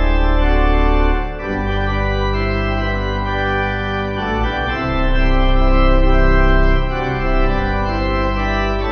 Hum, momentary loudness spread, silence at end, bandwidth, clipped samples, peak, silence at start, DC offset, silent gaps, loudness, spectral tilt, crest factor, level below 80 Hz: none; 5 LU; 0 s; 6.2 kHz; under 0.1%; -2 dBFS; 0 s; under 0.1%; none; -18 LUFS; -7.5 dB/octave; 12 dB; -16 dBFS